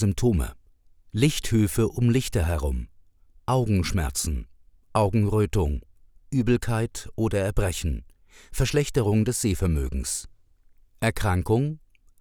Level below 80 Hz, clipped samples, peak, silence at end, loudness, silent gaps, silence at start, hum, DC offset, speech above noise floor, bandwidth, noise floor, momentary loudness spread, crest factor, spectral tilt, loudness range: -36 dBFS; under 0.1%; -6 dBFS; 0.45 s; -25 LUFS; none; 0 s; none; under 0.1%; 32 dB; over 20 kHz; -56 dBFS; 9 LU; 18 dB; -6 dB/octave; 2 LU